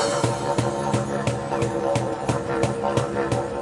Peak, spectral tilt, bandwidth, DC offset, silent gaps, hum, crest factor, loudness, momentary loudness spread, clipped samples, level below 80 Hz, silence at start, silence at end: -4 dBFS; -5.5 dB/octave; 11.5 kHz; under 0.1%; none; none; 18 dB; -24 LUFS; 2 LU; under 0.1%; -48 dBFS; 0 s; 0 s